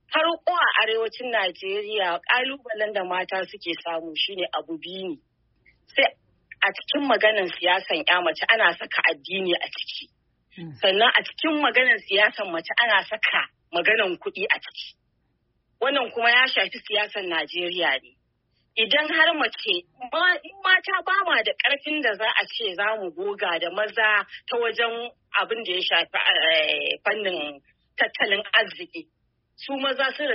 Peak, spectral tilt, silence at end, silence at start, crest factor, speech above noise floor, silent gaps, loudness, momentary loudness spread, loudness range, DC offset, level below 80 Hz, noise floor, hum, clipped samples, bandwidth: -4 dBFS; 1.5 dB/octave; 0 s; 0.1 s; 20 dB; 47 dB; none; -22 LUFS; 12 LU; 5 LU; under 0.1%; -74 dBFS; -71 dBFS; none; under 0.1%; 5.8 kHz